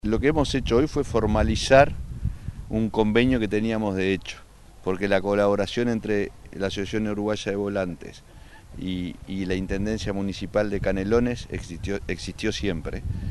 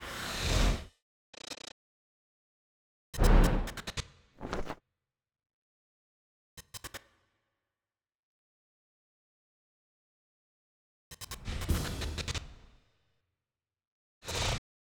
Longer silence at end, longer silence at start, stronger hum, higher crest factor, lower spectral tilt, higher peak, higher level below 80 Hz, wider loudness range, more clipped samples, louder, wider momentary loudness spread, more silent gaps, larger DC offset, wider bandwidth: second, 0 s vs 0.4 s; about the same, 0.05 s vs 0 s; neither; about the same, 20 dB vs 24 dB; first, -6 dB/octave vs -4.5 dB/octave; first, -4 dBFS vs -12 dBFS; about the same, -36 dBFS vs -38 dBFS; second, 7 LU vs 18 LU; neither; first, -25 LUFS vs -34 LUFS; second, 12 LU vs 21 LU; second, none vs 1.02-1.33 s, 1.72-3.13 s, 5.53-6.57 s, 8.15-11.11 s, 13.87-14.21 s; neither; second, 12 kHz vs over 20 kHz